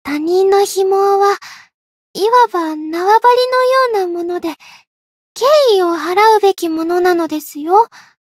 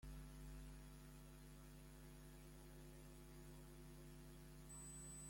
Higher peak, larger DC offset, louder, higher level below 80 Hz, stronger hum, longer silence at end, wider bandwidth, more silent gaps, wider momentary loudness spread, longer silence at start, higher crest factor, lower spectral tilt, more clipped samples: first, 0 dBFS vs -46 dBFS; neither; first, -13 LUFS vs -60 LUFS; about the same, -64 dBFS vs -62 dBFS; neither; first, 0.4 s vs 0 s; about the same, 16 kHz vs 16.5 kHz; first, 1.74-2.14 s, 4.87-5.35 s vs none; first, 11 LU vs 5 LU; about the same, 0.05 s vs 0 s; about the same, 14 dB vs 12 dB; second, -2.5 dB/octave vs -4.5 dB/octave; neither